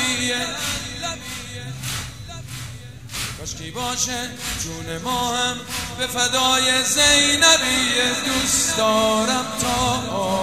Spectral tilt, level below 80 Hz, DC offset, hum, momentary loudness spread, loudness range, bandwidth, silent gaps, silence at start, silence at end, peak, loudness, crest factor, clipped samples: -1.5 dB/octave; -44 dBFS; 0.4%; none; 18 LU; 12 LU; 16 kHz; none; 0 s; 0 s; 0 dBFS; -19 LUFS; 22 dB; under 0.1%